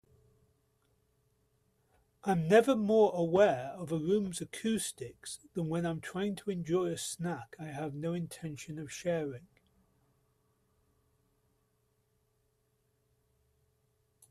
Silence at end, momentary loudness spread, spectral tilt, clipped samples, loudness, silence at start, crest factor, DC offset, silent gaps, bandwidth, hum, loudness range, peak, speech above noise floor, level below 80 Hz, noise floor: 4.85 s; 16 LU; -5.5 dB/octave; under 0.1%; -32 LUFS; 2.25 s; 22 dB; under 0.1%; none; 14.5 kHz; none; 13 LU; -12 dBFS; 44 dB; -70 dBFS; -76 dBFS